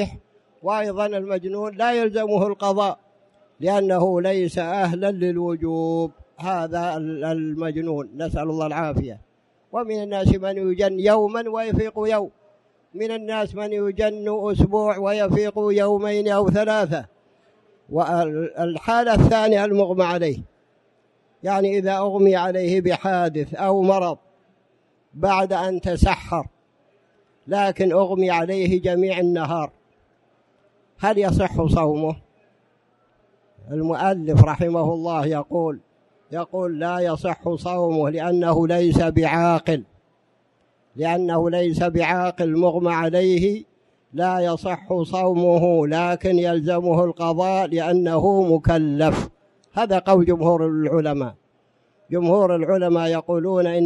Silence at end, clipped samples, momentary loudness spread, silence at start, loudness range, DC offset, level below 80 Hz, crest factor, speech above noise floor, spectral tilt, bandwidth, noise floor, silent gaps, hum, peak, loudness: 0 s; under 0.1%; 9 LU; 0 s; 5 LU; under 0.1%; -40 dBFS; 20 dB; 44 dB; -7.5 dB/octave; 11.5 kHz; -64 dBFS; none; none; 0 dBFS; -21 LUFS